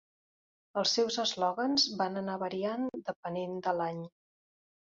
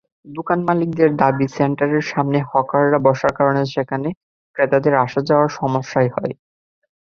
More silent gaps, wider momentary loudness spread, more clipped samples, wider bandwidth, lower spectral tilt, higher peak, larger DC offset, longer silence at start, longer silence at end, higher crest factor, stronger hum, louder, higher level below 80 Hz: second, 3.16-3.23 s vs 4.17-4.54 s; about the same, 10 LU vs 12 LU; neither; about the same, 7.6 kHz vs 7.2 kHz; second, -2.5 dB/octave vs -7.5 dB/octave; second, -16 dBFS vs -2 dBFS; neither; first, 0.75 s vs 0.25 s; about the same, 0.75 s vs 0.7 s; about the same, 18 dB vs 16 dB; neither; second, -32 LUFS vs -18 LUFS; second, -78 dBFS vs -56 dBFS